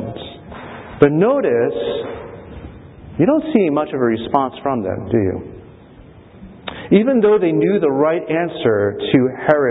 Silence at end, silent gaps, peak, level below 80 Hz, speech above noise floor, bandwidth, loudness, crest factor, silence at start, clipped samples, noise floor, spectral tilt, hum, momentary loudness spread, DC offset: 0 s; none; 0 dBFS; -46 dBFS; 26 dB; 4 kHz; -16 LUFS; 18 dB; 0 s; under 0.1%; -42 dBFS; -10.5 dB/octave; none; 20 LU; under 0.1%